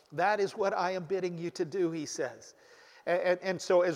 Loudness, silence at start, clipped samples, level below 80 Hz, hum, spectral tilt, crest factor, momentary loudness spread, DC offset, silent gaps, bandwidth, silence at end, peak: -32 LUFS; 0.1 s; under 0.1%; -80 dBFS; none; -5 dB/octave; 16 dB; 8 LU; under 0.1%; none; 13 kHz; 0 s; -14 dBFS